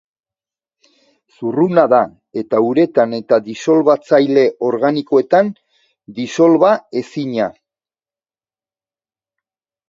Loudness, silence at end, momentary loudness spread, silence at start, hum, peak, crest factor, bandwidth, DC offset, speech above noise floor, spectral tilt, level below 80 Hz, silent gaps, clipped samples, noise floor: -15 LUFS; 2.4 s; 11 LU; 1.4 s; none; 0 dBFS; 16 dB; 7.6 kHz; under 0.1%; over 76 dB; -6.5 dB/octave; -64 dBFS; none; under 0.1%; under -90 dBFS